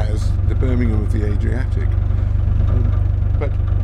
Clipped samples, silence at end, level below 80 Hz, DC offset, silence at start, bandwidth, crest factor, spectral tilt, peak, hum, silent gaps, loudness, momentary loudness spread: under 0.1%; 0 s; -18 dBFS; under 0.1%; 0 s; 6.6 kHz; 10 dB; -9 dB/octave; -6 dBFS; none; none; -19 LUFS; 2 LU